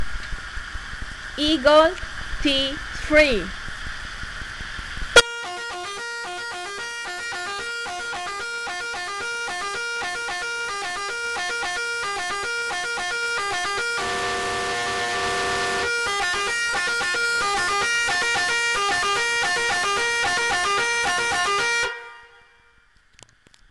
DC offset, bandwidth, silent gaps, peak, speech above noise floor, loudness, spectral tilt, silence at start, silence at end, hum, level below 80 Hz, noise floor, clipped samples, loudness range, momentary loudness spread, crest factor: under 0.1%; 12.5 kHz; none; -2 dBFS; 39 dB; -23 LUFS; -1.5 dB/octave; 0 s; 1.45 s; none; -42 dBFS; -57 dBFS; under 0.1%; 7 LU; 13 LU; 22 dB